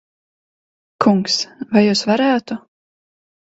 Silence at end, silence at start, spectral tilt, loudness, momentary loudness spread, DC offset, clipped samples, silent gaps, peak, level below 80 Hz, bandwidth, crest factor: 1 s; 1 s; -4.5 dB/octave; -16 LUFS; 8 LU; under 0.1%; under 0.1%; none; 0 dBFS; -60 dBFS; 8 kHz; 20 dB